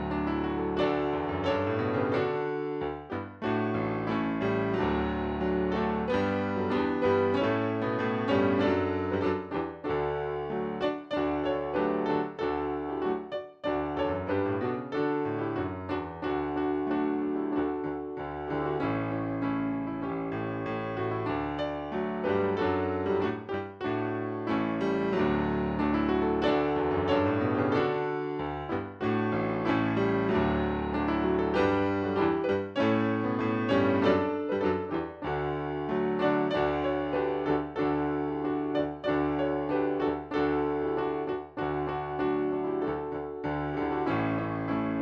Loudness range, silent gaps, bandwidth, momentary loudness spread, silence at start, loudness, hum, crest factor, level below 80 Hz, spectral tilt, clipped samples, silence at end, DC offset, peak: 4 LU; none; 7 kHz; 7 LU; 0 s; -30 LUFS; none; 16 dB; -50 dBFS; -8.5 dB/octave; under 0.1%; 0 s; under 0.1%; -12 dBFS